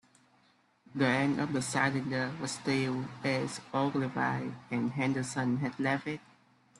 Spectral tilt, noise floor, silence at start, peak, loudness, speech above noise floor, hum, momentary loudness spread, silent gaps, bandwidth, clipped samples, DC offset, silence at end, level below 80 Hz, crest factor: -5.5 dB/octave; -68 dBFS; 0.95 s; -14 dBFS; -32 LUFS; 36 dB; none; 6 LU; none; 12 kHz; under 0.1%; under 0.1%; 0.6 s; -70 dBFS; 20 dB